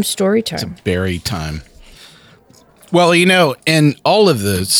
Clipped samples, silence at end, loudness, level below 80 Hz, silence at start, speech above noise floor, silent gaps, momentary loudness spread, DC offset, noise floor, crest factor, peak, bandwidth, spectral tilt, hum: under 0.1%; 0 s; -14 LUFS; -42 dBFS; 0 s; 33 dB; none; 12 LU; under 0.1%; -47 dBFS; 14 dB; -2 dBFS; 18 kHz; -4.5 dB/octave; none